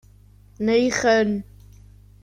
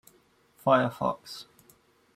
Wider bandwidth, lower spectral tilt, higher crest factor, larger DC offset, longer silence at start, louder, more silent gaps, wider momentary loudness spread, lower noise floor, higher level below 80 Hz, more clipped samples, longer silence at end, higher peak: second, 13 kHz vs 16 kHz; second, -4.5 dB/octave vs -6 dB/octave; second, 16 dB vs 22 dB; neither; about the same, 0.6 s vs 0.65 s; first, -21 LUFS vs -27 LUFS; neither; second, 9 LU vs 19 LU; second, -50 dBFS vs -64 dBFS; first, -50 dBFS vs -68 dBFS; neither; about the same, 0.8 s vs 0.75 s; first, -6 dBFS vs -10 dBFS